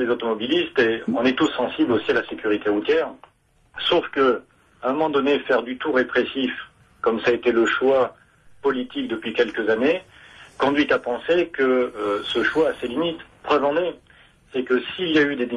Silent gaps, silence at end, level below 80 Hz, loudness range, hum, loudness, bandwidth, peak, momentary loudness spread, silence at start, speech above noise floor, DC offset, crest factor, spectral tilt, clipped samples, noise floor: none; 0 s; -58 dBFS; 2 LU; none; -22 LUFS; 11.5 kHz; -8 dBFS; 7 LU; 0 s; 32 dB; under 0.1%; 14 dB; -5 dB/octave; under 0.1%; -53 dBFS